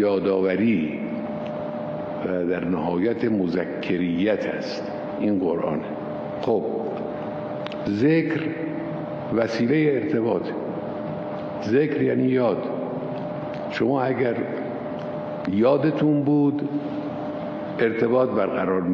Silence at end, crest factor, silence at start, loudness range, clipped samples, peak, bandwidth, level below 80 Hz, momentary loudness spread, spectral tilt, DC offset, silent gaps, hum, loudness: 0 s; 16 dB; 0 s; 3 LU; under 0.1%; -8 dBFS; 7 kHz; -60 dBFS; 10 LU; -8.5 dB/octave; under 0.1%; none; none; -24 LUFS